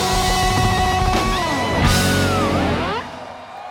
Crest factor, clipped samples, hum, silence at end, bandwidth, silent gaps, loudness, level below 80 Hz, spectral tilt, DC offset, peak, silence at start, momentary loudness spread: 14 dB; under 0.1%; none; 0 s; 19.5 kHz; none; -18 LUFS; -28 dBFS; -4.5 dB/octave; under 0.1%; -4 dBFS; 0 s; 14 LU